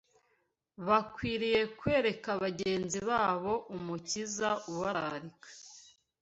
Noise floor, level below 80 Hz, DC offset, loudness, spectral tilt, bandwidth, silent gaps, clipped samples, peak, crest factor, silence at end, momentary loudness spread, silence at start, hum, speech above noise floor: -77 dBFS; -62 dBFS; under 0.1%; -33 LUFS; -4 dB/octave; 8.2 kHz; none; under 0.1%; -14 dBFS; 20 dB; 0.4 s; 14 LU; 0.8 s; none; 44 dB